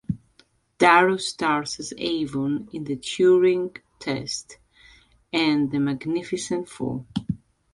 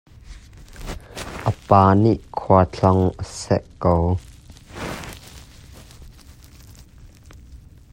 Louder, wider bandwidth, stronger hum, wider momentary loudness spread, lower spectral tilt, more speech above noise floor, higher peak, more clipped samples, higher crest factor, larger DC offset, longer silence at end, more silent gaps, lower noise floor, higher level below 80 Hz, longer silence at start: second, -23 LUFS vs -19 LUFS; second, 11.5 kHz vs 16 kHz; neither; second, 15 LU vs 21 LU; second, -4.5 dB/octave vs -7.5 dB/octave; first, 38 dB vs 27 dB; about the same, -2 dBFS vs 0 dBFS; neither; about the same, 22 dB vs 22 dB; neither; about the same, 0.35 s vs 0.35 s; neither; first, -61 dBFS vs -45 dBFS; second, -56 dBFS vs -42 dBFS; second, 0.1 s vs 0.3 s